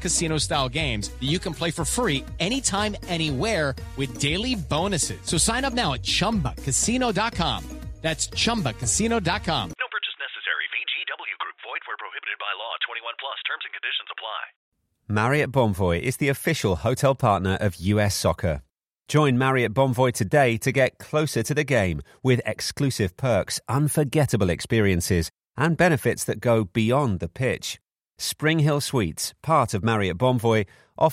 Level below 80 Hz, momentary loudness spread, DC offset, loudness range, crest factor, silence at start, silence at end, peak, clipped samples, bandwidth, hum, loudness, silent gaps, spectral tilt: -42 dBFS; 9 LU; under 0.1%; 6 LU; 18 dB; 0 s; 0 s; -6 dBFS; under 0.1%; 16 kHz; none; -24 LUFS; 14.56-14.72 s; -4.5 dB/octave